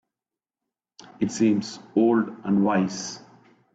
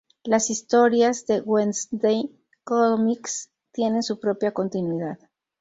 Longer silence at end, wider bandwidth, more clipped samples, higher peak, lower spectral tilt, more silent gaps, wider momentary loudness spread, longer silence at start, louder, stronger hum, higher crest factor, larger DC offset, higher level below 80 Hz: about the same, 0.55 s vs 0.45 s; about the same, 8 kHz vs 8 kHz; neither; second, -10 dBFS vs -6 dBFS; first, -6 dB/octave vs -4.5 dB/octave; neither; about the same, 12 LU vs 12 LU; first, 1.2 s vs 0.25 s; about the same, -24 LUFS vs -23 LUFS; neither; about the same, 16 dB vs 18 dB; neither; about the same, -66 dBFS vs -68 dBFS